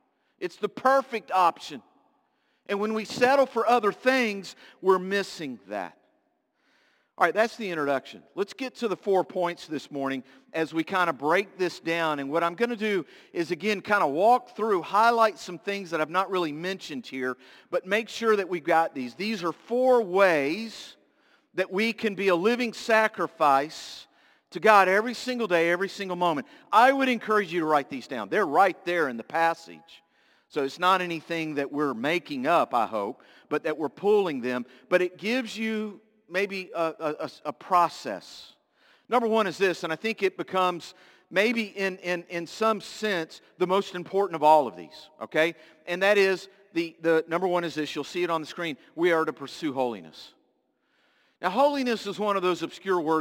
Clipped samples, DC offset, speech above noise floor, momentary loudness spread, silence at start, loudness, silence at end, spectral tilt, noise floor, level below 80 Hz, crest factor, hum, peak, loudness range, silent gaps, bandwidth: under 0.1%; under 0.1%; 46 dB; 13 LU; 0.4 s; -26 LUFS; 0 s; -4.5 dB/octave; -72 dBFS; -78 dBFS; 24 dB; none; -2 dBFS; 5 LU; none; 17 kHz